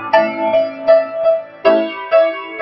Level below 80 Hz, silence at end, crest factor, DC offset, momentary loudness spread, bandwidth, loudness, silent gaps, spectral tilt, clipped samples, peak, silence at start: -60 dBFS; 0 s; 14 dB; under 0.1%; 4 LU; 5.8 kHz; -15 LUFS; none; -6.5 dB/octave; under 0.1%; 0 dBFS; 0 s